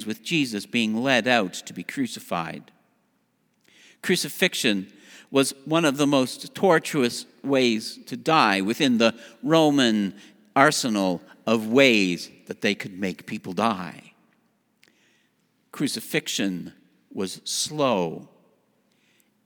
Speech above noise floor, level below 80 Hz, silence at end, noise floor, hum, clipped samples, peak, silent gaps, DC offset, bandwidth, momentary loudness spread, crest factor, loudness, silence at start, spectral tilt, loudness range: 46 dB; -74 dBFS; 1.2 s; -69 dBFS; none; under 0.1%; 0 dBFS; none; under 0.1%; over 20 kHz; 14 LU; 24 dB; -23 LUFS; 0 s; -4 dB/octave; 9 LU